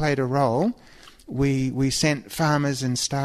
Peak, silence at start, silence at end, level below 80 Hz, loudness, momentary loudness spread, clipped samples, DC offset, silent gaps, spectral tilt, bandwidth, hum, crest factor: -8 dBFS; 0 s; 0 s; -48 dBFS; -23 LUFS; 5 LU; under 0.1%; under 0.1%; none; -5 dB/octave; 13.5 kHz; none; 16 dB